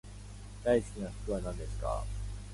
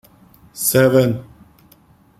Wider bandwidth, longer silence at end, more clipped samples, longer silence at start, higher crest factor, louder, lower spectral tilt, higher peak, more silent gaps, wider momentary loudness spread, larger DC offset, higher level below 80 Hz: second, 11.5 kHz vs 16.5 kHz; second, 0 s vs 0.95 s; neither; second, 0.05 s vs 0.55 s; about the same, 18 dB vs 18 dB; second, -35 LUFS vs -16 LUFS; first, -6.5 dB/octave vs -5 dB/octave; second, -16 dBFS vs -2 dBFS; neither; about the same, 17 LU vs 17 LU; neither; first, -42 dBFS vs -52 dBFS